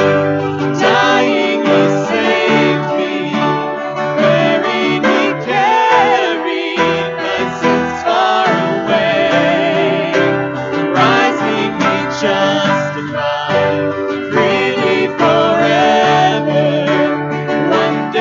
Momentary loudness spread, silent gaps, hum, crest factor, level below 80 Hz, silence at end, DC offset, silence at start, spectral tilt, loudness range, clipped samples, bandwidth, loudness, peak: 6 LU; none; none; 12 dB; -56 dBFS; 0 s; under 0.1%; 0 s; -5.5 dB/octave; 2 LU; under 0.1%; 7.6 kHz; -13 LUFS; 0 dBFS